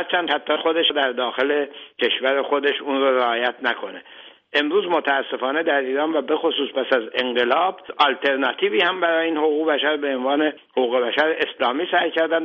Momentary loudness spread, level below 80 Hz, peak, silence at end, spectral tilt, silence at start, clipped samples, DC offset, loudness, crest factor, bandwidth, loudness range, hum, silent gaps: 5 LU; -72 dBFS; -4 dBFS; 0 s; -5 dB/octave; 0 s; under 0.1%; under 0.1%; -21 LUFS; 18 dB; 6.6 kHz; 2 LU; none; none